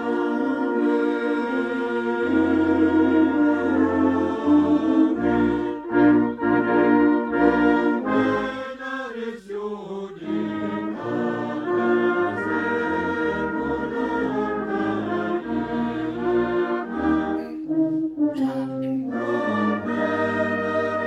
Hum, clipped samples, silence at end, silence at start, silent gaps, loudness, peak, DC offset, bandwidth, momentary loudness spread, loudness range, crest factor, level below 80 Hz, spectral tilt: none; under 0.1%; 0 s; 0 s; none; -22 LUFS; -6 dBFS; under 0.1%; 7.4 kHz; 9 LU; 6 LU; 16 dB; -52 dBFS; -7.5 dB/octave